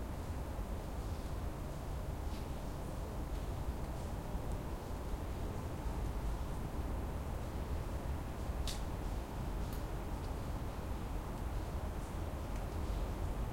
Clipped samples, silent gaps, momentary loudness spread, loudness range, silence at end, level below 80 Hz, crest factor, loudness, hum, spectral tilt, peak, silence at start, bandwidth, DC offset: under 0.1%; none; 2 LU; 1 LU; 0 s; -42 dBFS; 14 dB; -43 LUFS; none; -6.5 dB/octave; -26 dBFS; 0 s; 16.5 kHz; under 0.1%